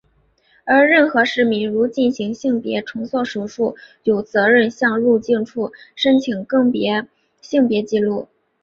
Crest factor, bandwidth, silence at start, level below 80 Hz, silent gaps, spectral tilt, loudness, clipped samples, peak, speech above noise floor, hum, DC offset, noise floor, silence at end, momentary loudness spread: 16 dB; 7.4 kHz; 0.65 s; -60 dBFS; none; -5.5 dB/octave; -18 LUFS; under 0.1%; -2 dBFS; 42 dB; none; under 0.1%; -59 dBFS; 0.4 s; 10 LU